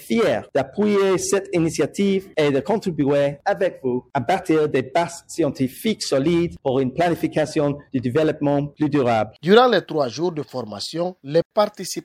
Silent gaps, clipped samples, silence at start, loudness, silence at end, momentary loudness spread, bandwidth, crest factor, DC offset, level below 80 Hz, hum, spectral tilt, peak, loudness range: 11.45-11.50 s; under 0.1%; 0 s; -21 LUFS; 0.05 s; 6 LU; 16 kHz; 20 dB; under 0.1%; -54 dBFS; none; -5.5 dB/octave; -2 dBFS; 2 LU